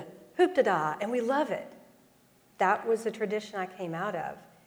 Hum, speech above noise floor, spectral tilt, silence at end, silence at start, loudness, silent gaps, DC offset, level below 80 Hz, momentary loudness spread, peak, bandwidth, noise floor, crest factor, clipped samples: none; 33 dB; -5.5 dB/octave; 0.2 s; 0 s; -30 LUFS; none; under 0.1%; -76 dBFS; 11 LU; -12 dBFS; over 20 kHz; -63 dBFS; 18 dB; under 0.1%